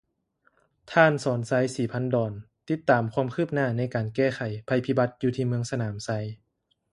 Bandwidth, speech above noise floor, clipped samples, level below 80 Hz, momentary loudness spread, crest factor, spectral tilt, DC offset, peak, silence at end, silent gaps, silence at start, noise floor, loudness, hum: 11.5 kHz; 44 dB; under 0.1%; -62 dBFS; 11 LU; 24 dB; -6.5 dB/octave; under 0.1%; -4 dBFS; 0.55 s; none; 0.85 s; -69 dBFS; -26 LUFS; none